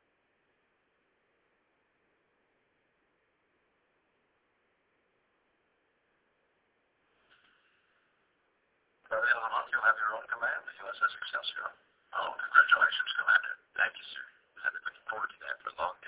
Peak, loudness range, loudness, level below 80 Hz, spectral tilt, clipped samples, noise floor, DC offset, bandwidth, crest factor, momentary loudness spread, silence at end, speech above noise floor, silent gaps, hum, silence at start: -8 dBFS; 6 LU; -30 LUFS; -80 dBFS; 4 dB/octave; under 0.1%; -75 dBFS; under 0.1%; 4 kHz; 26 dB; 16 LU; 0 s; 44 dB; none; none; 9.1 s